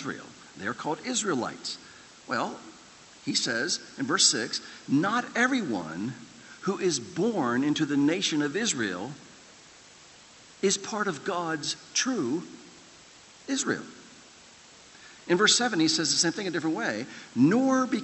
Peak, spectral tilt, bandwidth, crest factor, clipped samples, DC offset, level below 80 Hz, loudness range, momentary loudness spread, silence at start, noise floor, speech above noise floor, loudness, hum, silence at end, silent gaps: -8 dBFS; -3 dB/octave; 8.6 kHz; 22 dB; under 0.1%; under 0.1%; -72 dBFS; 6 LU; 18 LU; 0 s; -52 dBFS; 25 dB; -27 LUFS; none; 0 s; none